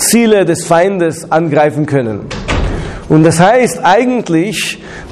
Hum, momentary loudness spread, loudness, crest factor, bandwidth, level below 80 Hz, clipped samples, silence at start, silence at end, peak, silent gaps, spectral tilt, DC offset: none; 11 LU; -11 LUFS; 10 dB; 14.5 kHz; -28 dBFS; under 0.1%; 0 s; 0 s; 0 dBFS; none; -5 dB/octave; under 0.1%